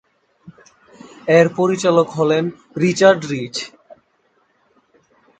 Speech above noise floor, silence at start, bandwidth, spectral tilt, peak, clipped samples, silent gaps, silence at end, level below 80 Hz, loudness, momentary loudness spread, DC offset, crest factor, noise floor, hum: 46 dB; 0.45 s; 9.2 kHz; -5.5 dB/octave; 0 dBFS; under 0.1%; none; 1.7 s; -60 dBFS; -16 LUFS; 13 LU; under 0.1%; 18 dB; -62 dBFS; none